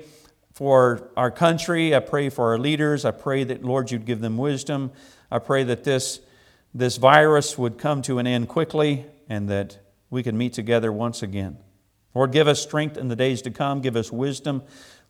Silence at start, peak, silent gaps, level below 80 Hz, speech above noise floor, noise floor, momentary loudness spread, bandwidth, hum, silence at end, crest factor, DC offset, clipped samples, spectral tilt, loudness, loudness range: 0 s; 0 dBFS; none; -62 dBFS; 39 dB; -61 dBFS; 12 LU; 16 kHz; none; 0.45 s; 22 dB; under 0.1%; under 0.1%; -5.5 dB/octave; -22 LUFS; 5 LU